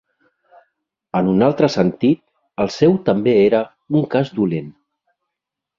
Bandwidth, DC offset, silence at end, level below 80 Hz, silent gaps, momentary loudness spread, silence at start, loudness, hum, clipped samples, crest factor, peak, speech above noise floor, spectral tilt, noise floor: 7.4 kHz; under 0.1%; 1.1 s; -54 dBFS; none; 9 LU; 1.15 s; -17 LUFS; none; under 0.1%; 18 dB; -2 dBFS; 67 dB; -7.5 dB/octave; -83 dBFS